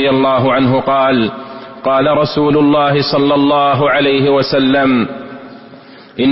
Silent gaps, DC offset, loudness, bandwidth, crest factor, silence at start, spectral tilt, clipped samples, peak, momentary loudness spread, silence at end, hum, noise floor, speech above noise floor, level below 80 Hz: none; under 0.1%; -12 LUFS; 5.8 kHz; 10 dB; 0 s; -9.5 dB/octave; under 0.1%; -2 dBFS; 14 LU; 0 s; none; -37 dBFS; 25 dB; -46 dBFS